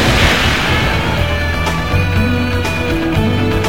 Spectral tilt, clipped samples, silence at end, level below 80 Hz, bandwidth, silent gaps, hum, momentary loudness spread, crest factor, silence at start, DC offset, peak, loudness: -5 dB/octave; under 0.1%; 0 s; -22 dBFS; 17 kHz; none; none; 5 LU; 14 dB; 0 s; 3%; 0 dBFS; -14 LUFS